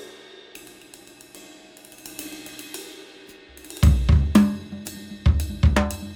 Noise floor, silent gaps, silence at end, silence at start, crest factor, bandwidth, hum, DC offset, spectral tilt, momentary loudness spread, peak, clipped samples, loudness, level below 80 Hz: -47 dBFS; none; 0 s; 0 s; 20 dB; 17.5 kHz; none; under 0.1%; -6.5 dB/octave; 26 LU; -4 dBFS; under 0.1%; -21 LUFS; -26 dBFS